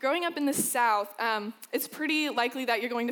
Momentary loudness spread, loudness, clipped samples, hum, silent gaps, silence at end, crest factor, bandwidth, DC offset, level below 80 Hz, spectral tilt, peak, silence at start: 8 LU; -28 LUFS; under 0.1%; none; none; 0 s; 16 dB; over 20 kHz; under 0.1%; -84 dBFS; -2 dB/octave; -14 dBFS; 0 s